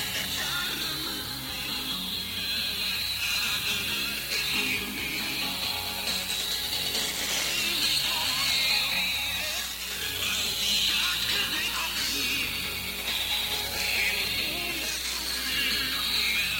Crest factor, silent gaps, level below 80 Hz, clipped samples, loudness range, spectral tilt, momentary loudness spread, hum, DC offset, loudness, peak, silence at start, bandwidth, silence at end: 16 dB; none; -50 dBFS; under 0.1%; 3 LU; -0.5 dB/octave; 6 LU; none; under 0.1%; -26 LUFS; -12 dBFS; 0 s; 17 kHz; 0 s